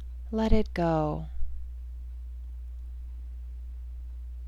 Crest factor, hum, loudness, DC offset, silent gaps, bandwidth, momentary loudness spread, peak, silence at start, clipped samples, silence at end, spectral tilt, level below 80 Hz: 22 dB; 60 Hz at -40 dBFS; -34 LUFS; under 0.1%; none; 7.2 kHz; 15 LU; -8 dBFS; 0 s; under 0.1%; 0 s; -8.5 dB/octave; -36 dBFS